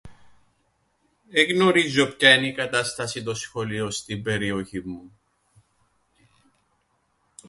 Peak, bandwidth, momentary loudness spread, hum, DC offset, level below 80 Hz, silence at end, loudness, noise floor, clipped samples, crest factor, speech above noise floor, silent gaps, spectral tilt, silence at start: 0 dBFS; 11.5 kHz; 15 LU; none; under 0.1%; -58 dBFS; 2.4 s; -22 LUFS; -69 dBFS; under 0.1%; 24 dB; 46 dB; none; -3.5 dB/octave; 0.05 s